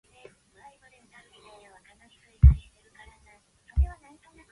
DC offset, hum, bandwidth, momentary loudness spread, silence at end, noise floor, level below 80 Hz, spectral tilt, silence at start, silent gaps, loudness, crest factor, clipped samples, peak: under 0.1%; none; 4.1 kHz; 13 LU; 0.6 s; -60 dBFS; -30 dBFS; -8.5 dB/octave; 2.45 s; none; -24 LUFS; 24 dB; under 0.1%; -4 dBFS